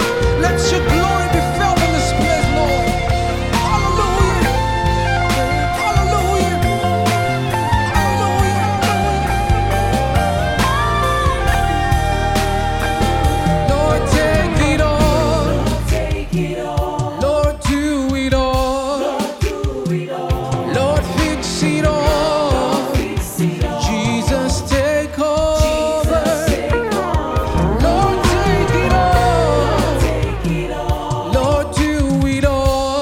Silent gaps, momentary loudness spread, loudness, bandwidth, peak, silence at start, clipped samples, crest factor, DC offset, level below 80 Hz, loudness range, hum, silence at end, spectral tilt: none; 5 LU; -16 LUFS; 16.5 kHz; 0 dBFS; 0 s; under 0.1%; 14 dB; under 0.1%; -22 dBFS; 3 LU; none; 0 s; -5.5 dB/octave